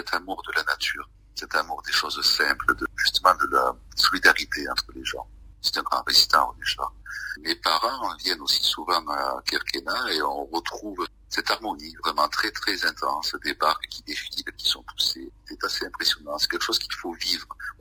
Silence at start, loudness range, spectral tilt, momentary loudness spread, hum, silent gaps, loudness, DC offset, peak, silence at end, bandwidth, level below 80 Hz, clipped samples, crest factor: 0 s; 5 LU; -0.5 dB/octave; 12 LU; none; none; -24 LUFS; under 0.1%; -2 dBFS; 0.1 s; 16 kHz; -50 dBFS; under 0.1%; 24 dB